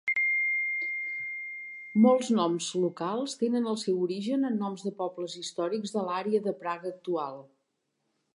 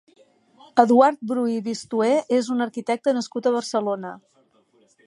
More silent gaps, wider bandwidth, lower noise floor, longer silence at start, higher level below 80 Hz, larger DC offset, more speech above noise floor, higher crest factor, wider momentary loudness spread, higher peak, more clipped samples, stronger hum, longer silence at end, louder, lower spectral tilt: neither; about the same, 11.5 kHz vs 11.5 kHz; first, -79 dBFS vs -61 dBFS; second, 0.05 s vs 0.75 s; second, -86 dBFS vs -76 dBFS; neither; first, 50 dB vs 40 dB; about the same, 20 dB vs 22 dB; about the same, 11 LU vs 10 LU; second, -10 dBFS vs -2 dBFS; neither; neither; about the same, 0.9 s vs 0.9 s; second, -29 LUFS vs -22 LUFS; about the same, -5 dB/octave vs -5 dB/octave